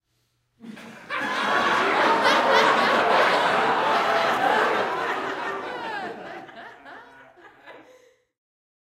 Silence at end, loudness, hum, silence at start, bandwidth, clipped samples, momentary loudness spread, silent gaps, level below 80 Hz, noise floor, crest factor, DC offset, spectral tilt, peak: 1.1 s; -21 LUFS; none; 0.65 s; 16 kHz; under 0.1%; 21 LU; none; -68 dBFS; -71 dBFS; 20 dB; under 0.1%; -3 dB/octave; -4 dBFS